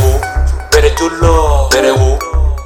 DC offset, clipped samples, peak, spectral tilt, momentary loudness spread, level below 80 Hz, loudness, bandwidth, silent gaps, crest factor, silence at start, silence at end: under 0.1%; under 0.1%; 0 dBFS; -5 dB/octave; 6 LU; -14 dBFS; -11 LUFS; 17 kHz; none; 10 dB; 0 s; 0 s